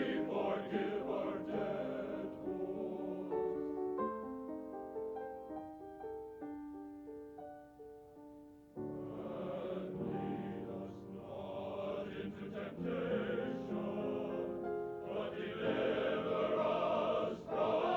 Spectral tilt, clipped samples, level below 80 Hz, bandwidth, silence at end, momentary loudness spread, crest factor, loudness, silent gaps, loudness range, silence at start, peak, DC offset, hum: -7.5 dB/octave; under 0.1%; -70 dBFS; 19.5 kHz; 0 s; 15 LU; 18 dB; -40 LUFS; none; 11 LU; 0 s; -22 dBFS; under 0.1%; none